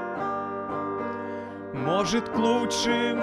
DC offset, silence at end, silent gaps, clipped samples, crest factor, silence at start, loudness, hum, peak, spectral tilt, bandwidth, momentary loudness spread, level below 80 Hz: under 0.1%; 0 s; none; under 0.1%; 16 dB; 0 s; -27 LUFS; none; -12 dBFS; -4 dB/octave; 13.5 kHz; 10 LU; -58 dBFS